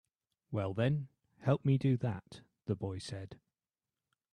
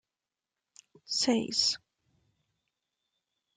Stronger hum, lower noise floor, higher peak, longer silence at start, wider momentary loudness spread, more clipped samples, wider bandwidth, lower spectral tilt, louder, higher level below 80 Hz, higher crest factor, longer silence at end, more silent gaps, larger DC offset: neither; about the same, under -90 dBFS vs under -90 dBFS; second, -18 dBFS vs -14 dBFS; second, 0.5 s vs 1.1 s; first, 16 LU vs 8 LU; neither; about the same, 10 kHz vs 11 kHz; first, -8 dB/octave vs -2 dB/octave; second, -35 LUFS vs -29 LUFS; first, -70 dBFS vs -76 dBFS; about the same, 20 dB vs 22 dB; second, 0.95 s vs 1.8 s; neither; neither